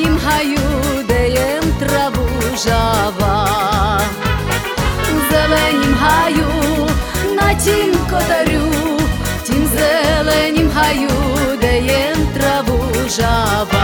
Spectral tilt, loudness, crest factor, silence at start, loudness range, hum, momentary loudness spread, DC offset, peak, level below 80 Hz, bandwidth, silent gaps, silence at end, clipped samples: -4.5 dB/octave; -15 LUFS; 14 dB; 0 s; 2 LU; none; 4 LU; under 0.1%; 0 dBFS; -24 dBFS; 19.5 kHz; none; 0 s; under 0.1%